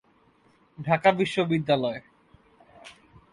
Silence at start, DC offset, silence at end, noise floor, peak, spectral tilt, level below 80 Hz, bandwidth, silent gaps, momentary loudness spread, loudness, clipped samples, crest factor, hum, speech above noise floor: 0.8 s; under 0.1%; 0.4 s; -62 dBFS; -8 dBFS; -6.5 dB/octave; -64 dBFS; 11.5 kHz; none; 13 LU; -25 LUFS; under 0.1%; 20 dB; none; 38 dB